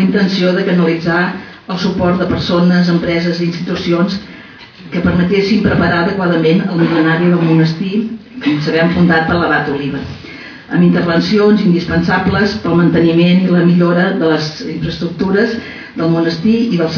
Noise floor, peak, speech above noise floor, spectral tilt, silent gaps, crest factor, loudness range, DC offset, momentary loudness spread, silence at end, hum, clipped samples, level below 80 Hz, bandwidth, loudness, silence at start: -35 dBFS; -2 dBFS; 23 dB; -7.5 dB/octave; none; 12 dB; 3 LU; under 0.1%; 10 LU; 0 s; none; under 0.1%; -40 dBFS; 5.4 kHz; -13 LUFS; 0 s